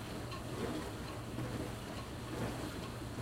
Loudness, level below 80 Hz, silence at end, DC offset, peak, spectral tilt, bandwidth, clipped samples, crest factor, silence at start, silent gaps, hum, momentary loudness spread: -43 LUFS; -54 dBFS; 0 s; under 0.1%; -26 dBFS; -5.5 dB/octave; 16 kHz; under 0.1%; 16 dB; 0 s; none; none; 4 LU